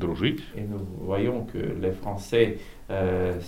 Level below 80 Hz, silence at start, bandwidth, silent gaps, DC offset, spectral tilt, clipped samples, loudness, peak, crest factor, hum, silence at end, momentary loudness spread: -44 dBFS; 0 s; 16 kHz; none; under 0.1%; -7 dB/octave; under 0.1%; -28 LUFS; -8 dBFS; 20 dB; none; 0 s; 10 LU